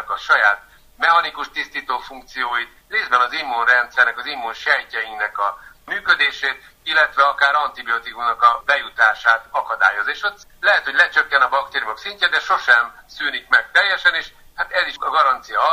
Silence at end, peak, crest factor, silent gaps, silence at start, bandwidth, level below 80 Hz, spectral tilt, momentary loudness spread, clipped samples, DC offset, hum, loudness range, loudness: 0 s; 0 dBFS; 18 dB; none; 0 s; 15.5 kHz; -56 dBFS; -0.5 dB/octave; 11 LU; under 0.1%; under 0.1%; none; 3 LU; -18 LUFS